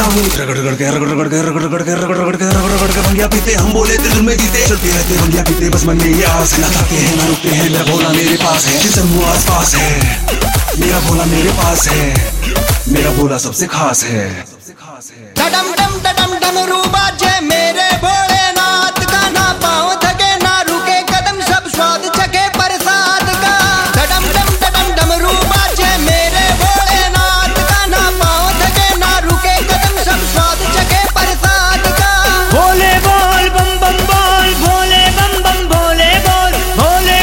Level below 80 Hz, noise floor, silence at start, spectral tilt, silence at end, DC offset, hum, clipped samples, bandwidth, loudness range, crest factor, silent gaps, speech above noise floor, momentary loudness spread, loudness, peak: -18 dBFS; -34 dBFS; 0 s; -3 dB/octave; 0 s; under 0.1%; none; under 0.1%; 16.5 kHz; 4 LU; 10 dB; none; 22 dB; 4 LU; -11 LUFS; 0 dBFS